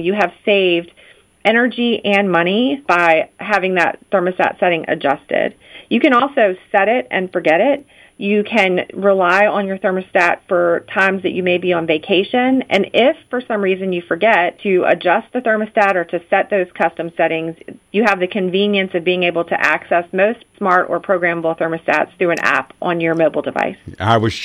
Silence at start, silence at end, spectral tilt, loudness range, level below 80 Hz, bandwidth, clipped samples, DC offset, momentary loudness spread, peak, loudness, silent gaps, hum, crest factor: 0 s; 0 s; -6 dB/octave; 2 LU; -58 dBFS; 11 kHz; under 0.1%; under 0.1%; 6 LU; 0 dBFS; -16 LUFS; none; none; 16 dB